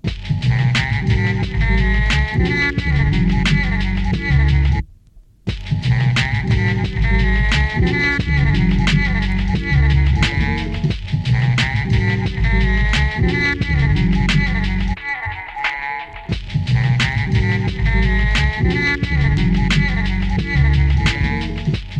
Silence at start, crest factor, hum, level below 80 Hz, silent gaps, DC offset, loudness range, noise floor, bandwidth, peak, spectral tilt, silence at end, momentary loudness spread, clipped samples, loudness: 0.05 s; 14 dB; none; -20 dBFS; none; under 0.1%; 2 LU; -46 dBFS; 9.2 kHz; -2 dBFS; -6 dB/octave; 0 s; 6 LU; under 0.1%; -17 LUFS